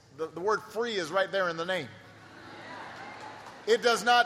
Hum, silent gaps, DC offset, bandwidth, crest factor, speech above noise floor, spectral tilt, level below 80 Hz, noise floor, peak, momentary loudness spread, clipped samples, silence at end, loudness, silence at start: none; none; under 0.1%; 15 kHz; 20 dB; 22 dB; -3 dB/octave; -74 dBFS; -50 dBFS; -10 dBFS; 21 LU; under 0.1%; 0 s; -29 LUFS; 0.15 s